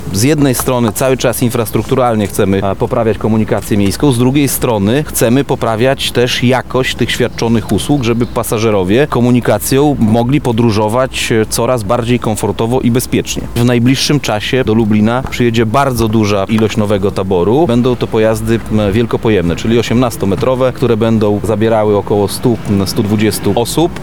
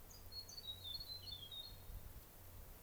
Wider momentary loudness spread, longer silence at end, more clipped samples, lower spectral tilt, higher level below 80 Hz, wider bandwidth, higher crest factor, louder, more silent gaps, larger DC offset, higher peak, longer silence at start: second, 3 LU vs 11 LU; about the same, 0 s vs 0 s; neither; first, -5.5 dB/octave vs -2.5 dB/octave; first, -32 dBFS vs -60 dBFS; about the same, 19.5 kHz vs over 20 kHz; about the same, 12 dB vs 16 dB; first, -12 LUFS vs -51 LUFS; neither; first, 4% vs under 0.1%; first, 0 dBFS vs -38 dBFS; about the same, 0 s vs 0 s